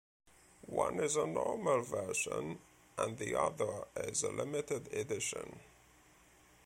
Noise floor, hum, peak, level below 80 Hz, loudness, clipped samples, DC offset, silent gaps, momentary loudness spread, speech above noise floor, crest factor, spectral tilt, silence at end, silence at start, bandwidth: -64 dBFS; none; -18 dBFS; -68 dBFS; -37 LUFS; under 0.1%; under 0.1%; none; 12 LU; 27 dB; 20 dB; -3.5 dB/octave; 0.95 s; 0.65 s; 16.5 kHz